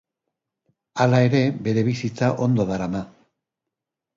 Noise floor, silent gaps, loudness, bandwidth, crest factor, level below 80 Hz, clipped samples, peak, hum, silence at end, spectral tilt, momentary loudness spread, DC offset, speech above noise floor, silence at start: -85 dBFS; none; -21 LUFS; 7.6 kHz; 18 dB; -56 dBFS; under 0.1%; -4 dBFS; none; 1.1 s; -7.5 dB/octave; 12 LU; under 0.1%; 65 dB; 0.95 s